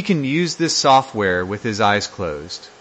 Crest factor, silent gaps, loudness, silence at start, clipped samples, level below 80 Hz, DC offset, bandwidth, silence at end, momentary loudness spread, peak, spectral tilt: 16 dB; none; -18 LUFS; 0 s; under 0.1%; -54 dBFS; under 0.1%; 8.8 kHz; 0.1 s; 13 LU; -2 dBFS; -4 dB/octave